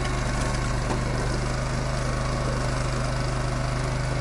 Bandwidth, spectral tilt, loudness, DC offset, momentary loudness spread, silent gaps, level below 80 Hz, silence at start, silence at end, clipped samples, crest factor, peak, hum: 11.5 kHz; -5 dB/octave; -27 LUFS; under 0.1%; 1 LU; none; -30 dBFS; 0 s; 0 s; under 0.1%; 12 dB; -14 dBFS; none